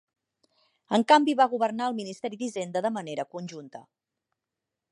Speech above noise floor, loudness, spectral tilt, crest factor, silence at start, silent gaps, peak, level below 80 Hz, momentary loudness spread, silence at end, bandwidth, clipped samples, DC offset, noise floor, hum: 61 dB; -26 LUFS; -4.5 dB/octave; 22 dB; 0.9 s; none; -6 dBFS; -82 dBFS; 18 LU; 1.1 s; 11.5 kHz; under 0.1%; under 0.1%; -87 dBFS; none